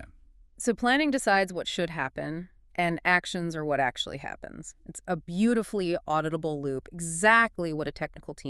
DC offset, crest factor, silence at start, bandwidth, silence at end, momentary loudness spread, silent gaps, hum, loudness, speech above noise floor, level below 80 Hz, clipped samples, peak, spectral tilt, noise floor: under 0.1%; 22 dB; 0 s; 13 kHz; 0 s; 14 LU; none; none; -27 LUFS; 27 dB; -54 dBFS; under 0.1%; -6 dBFS; -4 dB/octave; -55 dBFS